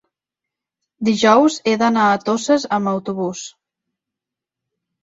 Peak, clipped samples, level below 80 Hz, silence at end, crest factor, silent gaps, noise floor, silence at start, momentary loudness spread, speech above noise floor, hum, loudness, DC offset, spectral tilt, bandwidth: -2 dBFS; under 0.1%; -62 dBFS; 1.55 s; 18 dB; none; -85 dBFS; 1 s; 12 LU; 69 dB; none; -17 LUFS; under 0.1%; -4.5 dB/octave; 8 kHz